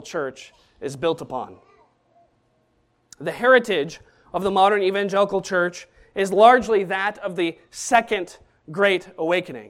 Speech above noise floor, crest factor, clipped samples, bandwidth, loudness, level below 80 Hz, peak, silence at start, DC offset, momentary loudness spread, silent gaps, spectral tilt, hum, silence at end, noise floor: 44 dB; 22 dB; under 0.1%; 15 kHz; -21 LUFS; -60 dBFS; 0 dBFS; 0 s; under 0.1%; 16 LU; none; -4 dB/octave; none; 0 s; -65 dBFS